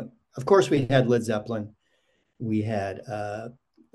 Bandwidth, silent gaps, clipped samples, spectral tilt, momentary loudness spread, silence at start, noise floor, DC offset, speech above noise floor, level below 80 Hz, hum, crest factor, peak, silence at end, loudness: 12.5 kHz; none; under 0.1%; -6.5 dB/octave; 17 LU; 0 s; -70 dBFS; under 0.1%; 46 dB; -60 dBFS; none; 20 dB; -6 dBFS; 0.45 s; -25 LUFS